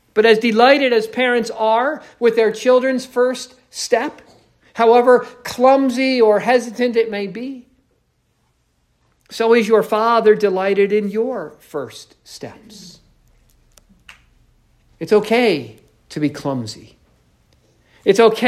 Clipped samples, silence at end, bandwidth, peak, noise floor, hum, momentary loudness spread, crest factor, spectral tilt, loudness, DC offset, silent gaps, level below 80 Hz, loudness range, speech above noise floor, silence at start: under 0.1%; 0 s; 14.5 kHz; 0 dBFS; -64 dBFS; none; 19 LU; 18 dB; -4.5 dB/octave; -16 LUFS; under 0.1%; none; -60 dBFS; 8 LU; 48 dB; 0.15 s